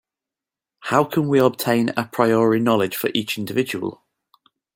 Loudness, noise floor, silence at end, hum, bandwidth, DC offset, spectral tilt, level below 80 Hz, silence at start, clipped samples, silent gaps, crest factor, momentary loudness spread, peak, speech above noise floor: -20 LUFS; -88 dBFS; 0.85 s; none; 17 kHz; under 0.1%; -5.5 dB/octave; -64 dBFS; 0.8 s; under 0.1%; none; 20 dB; 8 LU; -2 dBFS; 69 dB